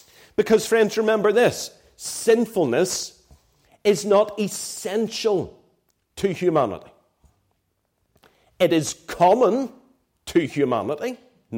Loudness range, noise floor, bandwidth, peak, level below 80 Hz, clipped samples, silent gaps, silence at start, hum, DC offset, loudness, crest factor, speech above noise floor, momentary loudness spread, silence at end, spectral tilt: 5 LU; -72 dBFS; 16.5 kHz; -6 dBFS; -60 dBFS; under 0.1%; none; 0.4 s; none; under 0.1%; -22 LUFS; 16 dB; 51 dB; 14 LU; 0 s; -4.5 dB/octave